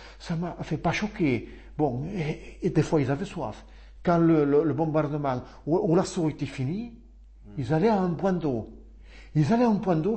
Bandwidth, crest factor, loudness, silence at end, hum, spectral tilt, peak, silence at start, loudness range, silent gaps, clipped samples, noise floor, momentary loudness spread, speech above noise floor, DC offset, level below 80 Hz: 8.8 kHz; 16 dB; -26 LUFS; 0 s; none; -7.5 dB/octave; -10 dBFS; 0 s; 3 LU; none; under 0.1%; -47 dBFS; 12 LU; 21 dB; under 0.1%; -48 dBFS